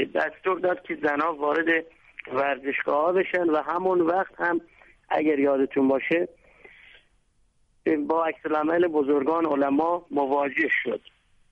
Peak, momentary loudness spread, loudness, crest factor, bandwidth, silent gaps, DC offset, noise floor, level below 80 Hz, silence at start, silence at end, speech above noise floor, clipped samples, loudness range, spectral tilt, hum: -12 dBFS; 5 LU; -25 LUFS; 14 dB; 6.2 kHz; none; under 0.1%; -65 dBFS; -66 dBFS; 0 s; 0.55 s; 41 dB; under 0.1%; 3 LU; -7 dB/octave; none